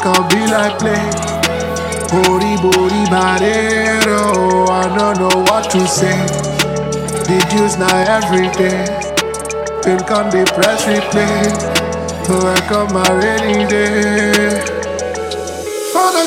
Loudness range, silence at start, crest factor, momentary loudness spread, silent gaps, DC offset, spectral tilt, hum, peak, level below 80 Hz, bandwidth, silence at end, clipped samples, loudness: 2 LU; 0 s; 14 dB; 7 LU; none; under 0.1%; -4 dB/octave; none; 0 dBFS; -38 dBFS; 17 kHz; 0 s; under 0.1%; -14 LUFS